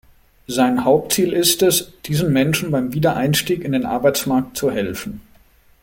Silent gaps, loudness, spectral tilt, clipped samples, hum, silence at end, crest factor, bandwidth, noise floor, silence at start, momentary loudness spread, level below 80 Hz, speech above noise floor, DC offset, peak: none; -18 LUFS; -4.5 dB/octave; under 0.1%; none; 0.65 s; 18 dB; 17 kHz; -52 dBFS; 0.5 s; 9 LU; -48 dBFS; 34 dB; under 0.1%; -2 dBFS